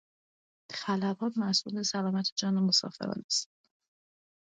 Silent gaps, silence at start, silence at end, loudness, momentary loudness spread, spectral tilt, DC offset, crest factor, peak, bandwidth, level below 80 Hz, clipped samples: 2.32-2.36 s, 3.24-3.29 s; 0.7 s; 1 s; -30 LUFS; 11 LU; -4 dB/octave; under 0.1%; 20 dB; -14 dBFS; 9.4 kHz; -78 dBFS; under 0.1%